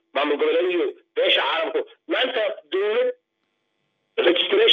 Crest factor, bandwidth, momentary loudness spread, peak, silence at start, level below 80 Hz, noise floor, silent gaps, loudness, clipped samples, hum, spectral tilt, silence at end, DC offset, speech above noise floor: 18 dB; 6.4 kHz; 8 LU; -4 dBFS; 0.15 s; under -90 dBFS; -74 dBFS; none; -22 LUFS; under 0.1%; none; -3.5 dB/octave; 0 s; under 0.1%; 53 dB